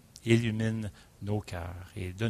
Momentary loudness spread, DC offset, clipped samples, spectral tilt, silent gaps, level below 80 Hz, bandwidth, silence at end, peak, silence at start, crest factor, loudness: 15 LU; under 0.1%; under 0.1%; -6.5 dB/octave; none; -54 dBFS; 13.5 kHz; 0 s; -10 dBFS; 0.25 s; 20 dB; -32 LUFS